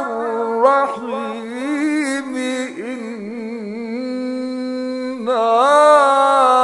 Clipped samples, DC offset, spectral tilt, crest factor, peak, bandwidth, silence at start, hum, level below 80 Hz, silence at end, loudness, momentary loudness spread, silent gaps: under 0.1%; under 0.1%; -3.5 dB/octave; 16 dB; 0 dBFS; 11 kHz; 0 s; none; -72 dBFS; 0 s; -17 LUFS; 16 LU; none